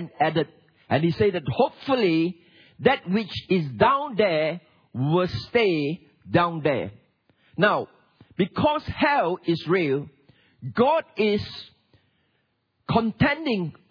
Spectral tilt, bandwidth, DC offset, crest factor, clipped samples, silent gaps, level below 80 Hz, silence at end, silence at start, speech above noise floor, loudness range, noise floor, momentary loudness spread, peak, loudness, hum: -8 dB/octave; 5.4 kHz; under 0.1%; 20 dB; under 0.1%; none; -54 dBFS; 0.2 s; 0 s; 49 dB; 3 LU; -72 dBFS; 12 LU; -4 dBFS; -24 LUFS; none